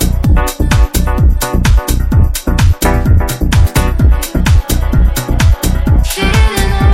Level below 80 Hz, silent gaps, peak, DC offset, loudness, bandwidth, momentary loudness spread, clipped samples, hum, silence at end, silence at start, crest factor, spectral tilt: -12 dBFS; none; 0 dBFS; under 0.1%; -12 LUFS; 16.5 kHz; 2 LU; 0.4%; none; 0 s; 0 s; 10 dB; -5.5 dB/octave